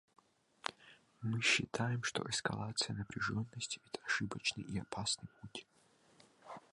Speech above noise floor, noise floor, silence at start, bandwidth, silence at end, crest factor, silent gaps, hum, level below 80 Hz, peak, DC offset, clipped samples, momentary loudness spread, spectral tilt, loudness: 30 dB; -70 dBFS; 0.65 s; 11.5 kHz; 0.15 s; 24 dB; none; none; -68 dBFS; -16 dBFS; under 0.1%; under 0.1%; 16 LU; -3 dB/octave; -38 LUFS